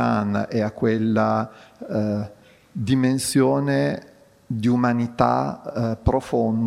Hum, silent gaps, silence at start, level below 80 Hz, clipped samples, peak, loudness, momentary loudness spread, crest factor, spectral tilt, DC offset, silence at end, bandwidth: none; none; 0 s; -42 dBFS; under 0.1%; -2 dBFS; -22 LUFS; 11 LU; 20 dB; -6.5 dB/octave; under 0.1%; 0 s; 15.5 kHz